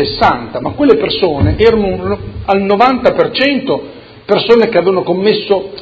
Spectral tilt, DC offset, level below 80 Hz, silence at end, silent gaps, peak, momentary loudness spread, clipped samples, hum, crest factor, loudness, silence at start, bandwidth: -7.5 dB/octave; under 0.1%; -30 dBFS; 0 s; none; 0 dBFS; 10 LU; 0.2%; none; 12 dB; -12 LUFS; 0 s; 7.4 kHz